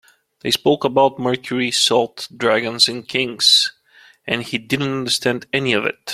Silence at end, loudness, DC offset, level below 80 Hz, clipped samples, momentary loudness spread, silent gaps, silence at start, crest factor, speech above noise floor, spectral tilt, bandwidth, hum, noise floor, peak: 0 s; -17 LUFS; under 0.1%; -60 dBFS; under 0.1%; 9 LU; none; 0.45 s; 18 dB; 32 dB; -3 dB/octave; 16 kHz; none; -50 dBFS; 0 dBFS